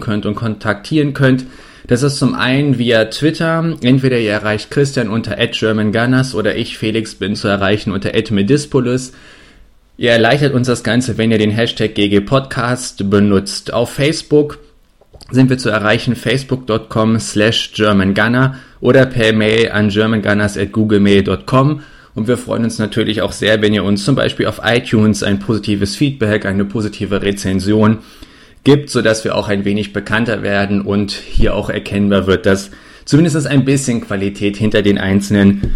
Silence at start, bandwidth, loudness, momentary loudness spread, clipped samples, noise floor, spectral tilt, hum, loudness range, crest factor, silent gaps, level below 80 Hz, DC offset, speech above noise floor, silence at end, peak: 0 s; 13 kHz; -14 LUFS; 6 LU; under 0.1%; -47 dBFS; -5.5 dB/octave; none; 3 LU; 14 dB; none; -34 dBFS; under 0.1%; 34 dB; 0 s; 0 dBFS